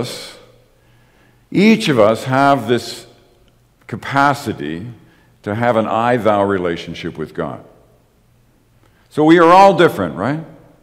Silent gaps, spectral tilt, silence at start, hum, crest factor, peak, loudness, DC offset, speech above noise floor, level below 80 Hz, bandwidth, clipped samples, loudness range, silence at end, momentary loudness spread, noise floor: none; -6 dB/octave; 0 s; none; 16 dB; 0 dBFS; -14 LUFS; under 0.1%; 39 dB; -54 dBFS; 16 kHz; under 0.1%; 6 LU; 0.35 s; 20 LU; -54 dBFS